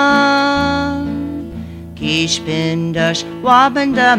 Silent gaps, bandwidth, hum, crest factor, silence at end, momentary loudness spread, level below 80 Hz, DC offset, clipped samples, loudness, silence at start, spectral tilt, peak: none; 15 kHz; none; 14 dB; 0 s; 14 LU; -40 dBFS; under 0.1%; under 0.1%; -15 LUFS; 0 s; -4.5 dB/octave; 0 dBFS